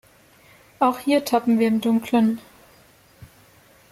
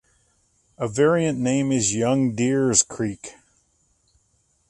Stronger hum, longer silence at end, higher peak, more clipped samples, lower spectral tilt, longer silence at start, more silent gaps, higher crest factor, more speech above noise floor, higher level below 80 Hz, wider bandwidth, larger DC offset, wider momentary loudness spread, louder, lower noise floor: neither; second, 0.65 s vs 1.4 s; second, -8 dBFS vs -4 dBFS; neither; about the same, -5.5 dB/octave vs -4.5 dB/octave; about the same, 0.8 s vs 0.8 s; neither; about the same, 16 dB vs 20 dB; second, 34 dB vs 45 dB; second, -62 dBFS vs -56 dBFS; first, 15.5 kHz vs 11.5 kHz; neither; second, 3 LU vs 11 LU; about the same, -21 LUFS vs -21 LUFS; second, -53 dBFS vs -66 dBFS